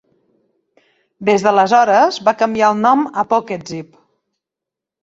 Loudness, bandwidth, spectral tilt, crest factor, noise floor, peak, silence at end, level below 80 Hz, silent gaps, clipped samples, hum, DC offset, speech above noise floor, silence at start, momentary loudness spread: -14 LUFS; 8 kHz; -5 dB/octave; 16 dB; -85 dBFS; -2 dBFS; 1.2 s; -60 dBFS; none; under 0.1%; none; under 0.1%; 71 dB; 1.2 s; 14 LU